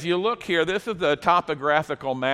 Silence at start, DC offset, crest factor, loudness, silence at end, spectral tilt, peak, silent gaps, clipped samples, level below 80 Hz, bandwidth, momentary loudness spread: 0 s; under 0.1%; 18 dB; -23 LUFS; 0 s; -5 dB/octave; -6 dBFS; none; under 0.1%; -58 dBFS; 13.5 kHz; 5 LU